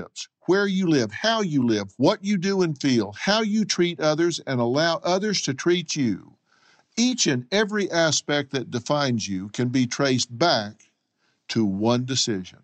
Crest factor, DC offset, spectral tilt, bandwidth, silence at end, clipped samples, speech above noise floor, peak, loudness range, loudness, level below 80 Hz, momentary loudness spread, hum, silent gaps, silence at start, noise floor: 18 dB; under 0.1%; -4 dB/octave; 8.8 kHz; 0.15 s; under 0.1%; 48 dB; -6 dBFS; 2 LU; -23 LUFS; -68 dBFS; 6 LU; none; none; 0 s; -71 dBFS